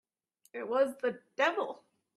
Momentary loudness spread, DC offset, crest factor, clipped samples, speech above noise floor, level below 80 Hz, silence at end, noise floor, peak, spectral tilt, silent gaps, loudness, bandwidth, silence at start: 15 LU; under 0.1%; 20 dB; under 0.1%; 40 dB; -84 dBFS; 0.4 s; -72 dBFS; -14 dBFS; -3.5 dB/octave; none; -33 LUFS; 13 kHz; 0.55 s